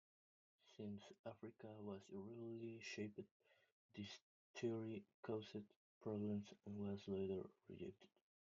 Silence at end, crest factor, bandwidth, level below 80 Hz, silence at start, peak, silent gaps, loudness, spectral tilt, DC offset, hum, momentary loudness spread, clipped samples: 0.4 s; 18 dB; 7.2 kHz; -88 dBFS; 0.65 s; -34 dBFS; 1.19-1.24 s, 3.31-3.40 s, 3.72-3.89 s, 4.22-4.54 s, 5.14-5.23 s, 5.76-6.01 s; -52 LUFS; -6 dB/octave; under 0.1%; none; 12 LU; under 0.1%